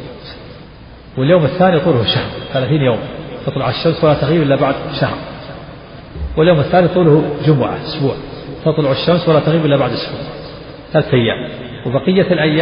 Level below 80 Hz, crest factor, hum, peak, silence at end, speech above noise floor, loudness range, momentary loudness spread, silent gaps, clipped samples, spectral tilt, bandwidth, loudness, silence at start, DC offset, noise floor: -38 dBFS; 14 dB; none; 0 dBFS; 0 s; 23 dB; 2 LU; 19 LU; none; under 0.1%; -5.5 dB/octave; 5.4 kHz; -14 LUFS; 0 s; under 0.1%; -36 dBFS